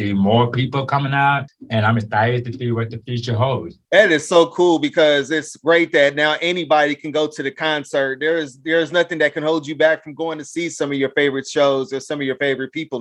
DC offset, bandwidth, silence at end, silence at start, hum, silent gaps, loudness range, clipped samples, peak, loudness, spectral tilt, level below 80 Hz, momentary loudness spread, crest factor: under 0.1%; 11.5 kHz; 0 s; 0 s; none; none; 4 LU; under 0.1%; 0 dBFS; -18 LUFS; -5.5 dB/octave; -60 dBFS; 9 LU; 18 dB